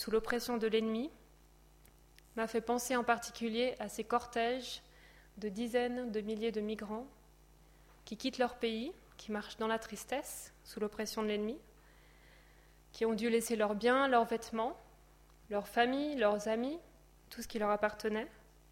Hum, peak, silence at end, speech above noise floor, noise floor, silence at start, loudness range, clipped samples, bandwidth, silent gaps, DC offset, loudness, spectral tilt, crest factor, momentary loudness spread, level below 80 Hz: none; -16 dBFS; 0.35 s; 27 dB; -63 dBFS; 0 s; 6 LU; under 0.1%; 16.5 kHz; none; under 0.1%; -36 LUFS; -4 dB/octave; 22 dB; 13 LU; -64 dBFS